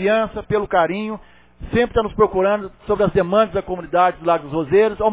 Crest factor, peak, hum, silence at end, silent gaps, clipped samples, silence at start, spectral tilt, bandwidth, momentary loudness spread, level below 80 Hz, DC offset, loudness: 16 dB; -2 dBFS; none; 0 s; none; under 0.1%; 0 s; -10 dB/octave; 4 kHz; 8 LU; -40 dBFS; under 0.1%; -19 LUFS